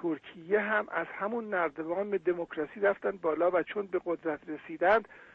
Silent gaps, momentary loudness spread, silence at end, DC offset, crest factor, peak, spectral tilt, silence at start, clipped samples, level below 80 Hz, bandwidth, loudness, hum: none; 9 LU; 0.1 s; under 0.1%; 18 dB; -14 dBFS; -7.5 dB/octave; 0 s; under 0.1%; -70 dBFS; 6 kHz; -31 LUFS; none